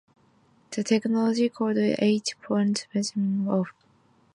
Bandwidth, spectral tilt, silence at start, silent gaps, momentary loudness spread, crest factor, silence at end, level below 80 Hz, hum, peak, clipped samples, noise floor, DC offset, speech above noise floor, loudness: 11 kHz; -5.5 dB/octave; 0.7 s; none; 6 LU; 16 dB; 0.65 s; -72 dBFS; none; -10 dBFS; under 0.1%; -62 dBFS; under 0.1%; 37 dB; -26 LUFS